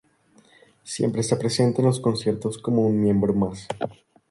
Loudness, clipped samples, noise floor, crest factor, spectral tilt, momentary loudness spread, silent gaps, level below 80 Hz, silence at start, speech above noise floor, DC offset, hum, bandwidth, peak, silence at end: -23 LUFS; under 0.1%; -58 dBFS; 16 dB; -6.5 dB/octave; 11 LU; none; -54 dBFS; 0.85 s; 36 dB; under 0.1%; none; 11.5 kHz; -8 dBFS; 0.35 s